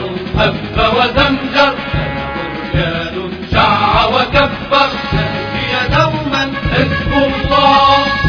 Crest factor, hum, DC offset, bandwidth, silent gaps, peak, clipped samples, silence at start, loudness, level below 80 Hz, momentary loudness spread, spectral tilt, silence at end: 14 dB; none; under 0.1%; 5.4 kHz; none; 0 dBFS; under 0.1%; 0 s; -13 LUFS; -28 dBFS; 8 LU; -6 dB/octave; 0 s